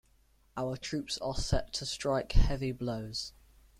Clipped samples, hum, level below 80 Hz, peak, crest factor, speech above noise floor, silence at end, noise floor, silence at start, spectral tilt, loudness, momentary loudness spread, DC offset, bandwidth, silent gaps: under 0.1%; none; -36 dBFS; -10 dBFS; 22 dB; 36 dB; 0.5 s; -66 dBFS; 0.55 s; -5 dB/octave; -35 LUFS; 8 LU; under 0.1%; 12.5 kHz; none